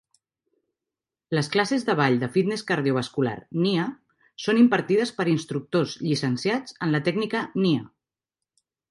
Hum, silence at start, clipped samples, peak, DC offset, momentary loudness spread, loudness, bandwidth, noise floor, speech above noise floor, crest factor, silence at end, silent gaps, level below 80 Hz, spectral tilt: none; 1.3 s; under 0.1%; -6 dBFS; under 0.1%; 7 LU; -24 LUFS; 11.5 kHz; -89 dBFS; 65 dB; 18 dB; 1.05 s; none; -68 dBFS; -6 dB/octave